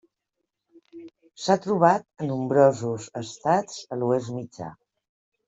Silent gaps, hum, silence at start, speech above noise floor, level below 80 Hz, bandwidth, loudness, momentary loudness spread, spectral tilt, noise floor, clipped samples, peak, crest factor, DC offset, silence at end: none; none; 0.95 s; 58 dB; -68 dBFS; 8.2 kHz; -24 LUFS; 16 LU; -6 dB/octave; -82 dBFS; under 0.1%; -4 dBFS; 22 dB; under 0.1%; 0.75 s